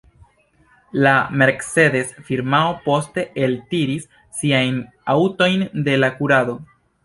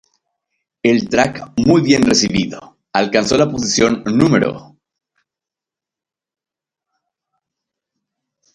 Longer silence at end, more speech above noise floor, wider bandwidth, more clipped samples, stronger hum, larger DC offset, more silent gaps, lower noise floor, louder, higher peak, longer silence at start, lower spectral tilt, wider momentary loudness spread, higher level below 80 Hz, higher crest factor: second, 0.4 s vs 3.9 s; second, 38 dB vs 73 dB; about the same, 11.5 kHz vs 11.5 kHz; neither; neither; neither; neither; second, -57 dBFS vs -88 dBFS; second, -18 LUFS vs -15 LUFS; about the same, -2 dBFS vs 0 dBFS; about the same, 0.95 s vs 0.85 s; about the same, -5.5 dB/octave vs -4.5 dB/octave; about the same, 10 LU vs 9 LU; second, -56 dBFS vs -46 dBFS; about the same, 18 dB vs 18 dB